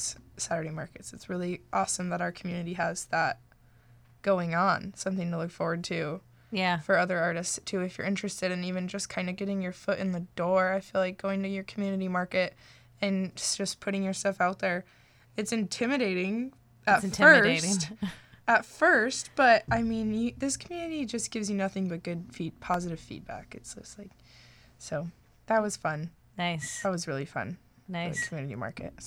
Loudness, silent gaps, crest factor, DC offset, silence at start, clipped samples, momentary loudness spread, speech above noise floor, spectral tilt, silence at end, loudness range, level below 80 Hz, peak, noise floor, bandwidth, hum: -29 LUFS; none; 24 dB; under 0.1%; 0 s; under 0.1%; 14 LU; 29 dB; -4 dB/octave; 0 s; 10 LU; -60 dBFS; -6 dBFS; -59 dBFS; 15.5 kHz; none